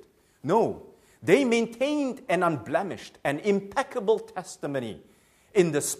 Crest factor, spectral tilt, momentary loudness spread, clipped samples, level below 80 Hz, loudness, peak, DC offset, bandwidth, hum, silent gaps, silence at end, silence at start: 22 dB; -5 dB/octave; 13 LU; under 0.1%; -66 dBFS; -26 LUFS; -6 dBFS; under 0.1%; 15.5 kHz; none; none; 0 s; 0.45 s